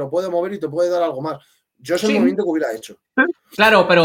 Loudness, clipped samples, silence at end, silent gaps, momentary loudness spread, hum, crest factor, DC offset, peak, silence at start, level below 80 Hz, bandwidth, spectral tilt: -18 LUFS; under 0.1%; 0 s; none; 15 LU; none; 18 dB; under 0.1%; 0 dBFS; 0 s; -58 dBFS; 17 kHz; -5 dB/octave